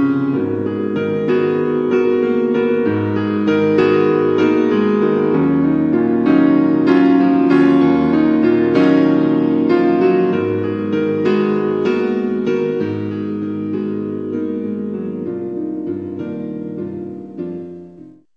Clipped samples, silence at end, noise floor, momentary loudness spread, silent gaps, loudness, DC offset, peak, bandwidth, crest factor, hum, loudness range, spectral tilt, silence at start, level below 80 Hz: under 0.1%; 0.25 s; -40 dBFS; 12 LU; none; -16 LUFS; 0.1%; -2 dBFS; 6.6 kHz; 14 dB; none; 10 LU; -9 dB/octave; 0 s; -54 dBFS